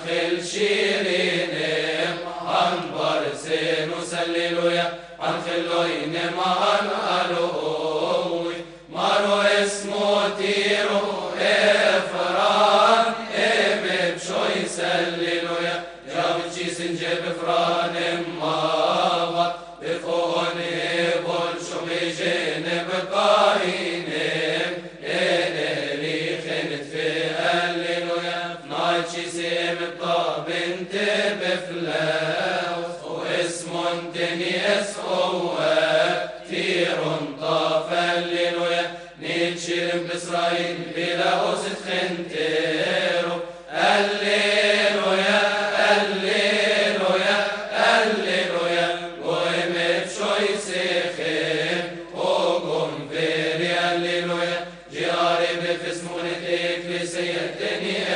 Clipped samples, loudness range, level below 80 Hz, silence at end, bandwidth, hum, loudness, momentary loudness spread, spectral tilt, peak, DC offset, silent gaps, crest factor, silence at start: under 0.1%; 5 LU; -62 dBFS; 0 s; 10 kHz; none; -22 LUFS; 8 LU; -3.5 dB/octave; -4 dBFS; under 0.1%; none; 18 dB; 0 s